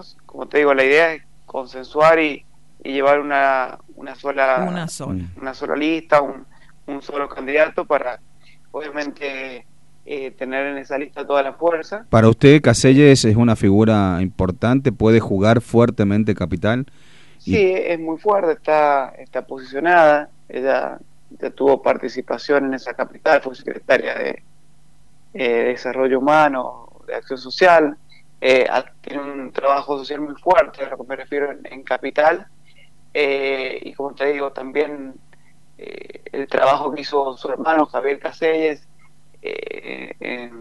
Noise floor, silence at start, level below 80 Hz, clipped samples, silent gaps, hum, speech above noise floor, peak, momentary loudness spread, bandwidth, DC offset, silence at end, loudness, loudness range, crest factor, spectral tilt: -55 dBFS; 0.35 s; -48 dBFS; under 0.1%; none; none; 37 dB; 0 dBFS; 17 LU; 11.5 kHz; 0.8%; 0 s; -18 LUFS; 9 LU; 18 dB; -6 dB/octave